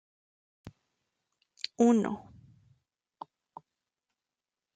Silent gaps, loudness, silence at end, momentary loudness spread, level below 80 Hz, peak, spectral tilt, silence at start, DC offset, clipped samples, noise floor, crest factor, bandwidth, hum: none; -29 LUFS; 2.6 s; 25 LU; -74 dBFS; -12 dBFS; -5.5 dB/octave; 0.65 s; under 0.1%; under 0.1%; under -90 dBFS; 22 dB; 9.2 kHz; none